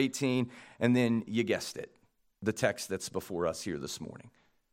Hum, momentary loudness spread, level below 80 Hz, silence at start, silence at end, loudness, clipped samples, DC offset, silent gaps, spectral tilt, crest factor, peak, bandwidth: none; 13 LU; -70 dBFS; 0 s; 0.45 s; -33 LUFS; under 0.1%; under 0.1%; none; -5 dB/octave; 22 dB; -12 dBFS; 16.5 kHz